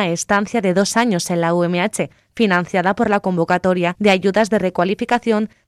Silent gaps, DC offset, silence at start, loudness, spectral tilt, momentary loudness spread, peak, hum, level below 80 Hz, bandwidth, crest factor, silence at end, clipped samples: none; under 0.1%; 0 s; -17 LUFS; -5 dB/octave; 4 LU; -4 dBFS; none; -54 dBFS; 14 kHz; 14 dB; 0.2 s; under 0.1%